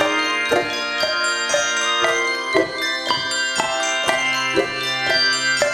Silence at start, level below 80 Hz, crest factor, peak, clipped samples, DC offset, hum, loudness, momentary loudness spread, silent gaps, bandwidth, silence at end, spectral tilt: 0 s; -56 dBFS; 20 dB; 0 dBFS; under 0.1%; under 0.1%; none; -18 LUFS; 4 LU; none; 17 kHz; 0 s; -1 dB/octave